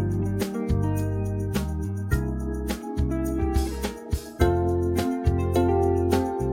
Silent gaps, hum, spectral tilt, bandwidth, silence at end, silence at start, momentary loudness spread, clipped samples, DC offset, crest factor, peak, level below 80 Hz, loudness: none; none; -7 dB/octave; 17 kHz; 0 s; 0 s; 8 LU; under 0.1%; under 0.1%; 18 dB; -6 dBFS; -32 dBFS; -26 LUFS